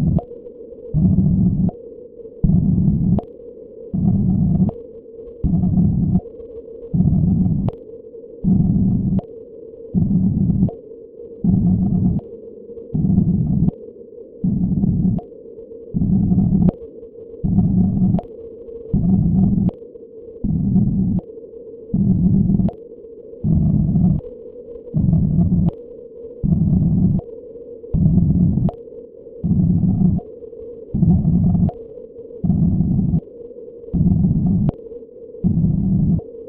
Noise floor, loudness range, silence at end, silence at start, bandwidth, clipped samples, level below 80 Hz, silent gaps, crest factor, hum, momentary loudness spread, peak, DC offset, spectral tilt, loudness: -38 dBFS; 1 LU; 0 s; 0 s; 1.3 kHz; under 0.1%; -30 dBFS; none; 16 dB; none; 21 LU; -2 dBFS; under 0.1%; -15.5 dB/octave; -18 LUFS